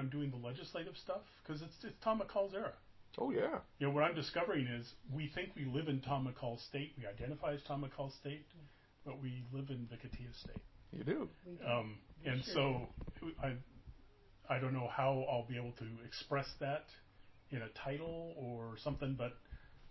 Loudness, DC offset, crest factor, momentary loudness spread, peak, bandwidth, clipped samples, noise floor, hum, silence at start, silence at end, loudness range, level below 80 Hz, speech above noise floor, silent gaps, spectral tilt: -42 LUFS; under 0.1%; 22 dB; 14 LU; -22 dBFS; 6 kHz; under 0.1%; -63 dBFS; none; 0 s; 0 s; 7 LU; -62 dBFS; 21 dB; none; -5 dB/octave